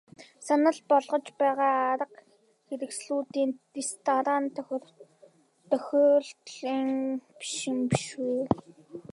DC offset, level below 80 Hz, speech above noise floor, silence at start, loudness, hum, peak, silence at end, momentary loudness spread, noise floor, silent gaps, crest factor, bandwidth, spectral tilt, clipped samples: under 0.1%; -66 dBFS; 32 dB; 0.2 s; -28 LUFS; none; -6 dBFS; 0.15 s; 14 LU; -60 dBFS; none; 24 dB; 11.5 kHz; -5 dB/octave; under 0.1%